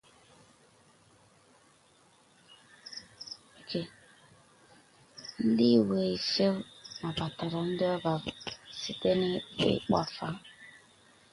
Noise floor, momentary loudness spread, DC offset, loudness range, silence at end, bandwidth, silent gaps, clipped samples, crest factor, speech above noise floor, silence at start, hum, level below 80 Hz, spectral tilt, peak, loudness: -63 dBFS; 20 LU; under 0.1%; 15 LU; 0.65 s; 11.5 kHz; none; under 0.1%; 22 dB; 34 dB; 2.85 s; none; -64 dBFS; -6 dB/octave; -12 dBFS; -31 LUFS